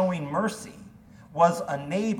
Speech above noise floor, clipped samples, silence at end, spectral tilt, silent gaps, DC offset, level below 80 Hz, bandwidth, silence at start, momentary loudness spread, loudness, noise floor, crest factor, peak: 23 dB; under 0.1%; 0 s; -6 dB/octave; none; under 0.1%; -62 dBFS; 17 kHz; 0 s; 16 LU; -26 LUFS; -49 dBFS; 20 dB; -6 dBFS